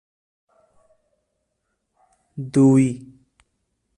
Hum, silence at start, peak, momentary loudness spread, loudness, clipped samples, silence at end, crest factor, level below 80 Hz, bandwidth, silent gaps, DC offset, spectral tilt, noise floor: none; 2.35 s; -6 dBFS; 22 LU; -18 LUFS; under 0.1%; 1 s; 18 dB; -62 dBFS; 11 kHz; none; under 0.1%; -8 dB/octave; -75 dBFS